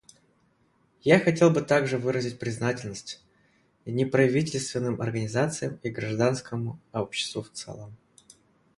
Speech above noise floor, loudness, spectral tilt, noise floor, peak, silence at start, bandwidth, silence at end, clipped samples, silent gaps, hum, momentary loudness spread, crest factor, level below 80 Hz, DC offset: 40 dB; -26 LUFS; -5.5 dB/octave; -67 dBFS; -4 dBFS; 1.05 s; 11.5 kHz; 0.85 s; under 0.1%; none; none; 18 LU; 24 dB; -62 dBFS; under 0.1%